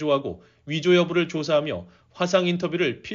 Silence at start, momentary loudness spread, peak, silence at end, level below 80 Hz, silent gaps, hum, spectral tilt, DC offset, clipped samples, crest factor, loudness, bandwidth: 0 s; 13 LU; -6 dBFS; 0 s; -62 dBFS; none; none; -4.5 dB/octave; under 0.1%; under 0.1%; 18 dB; -23 LUFS; 7.4 kHz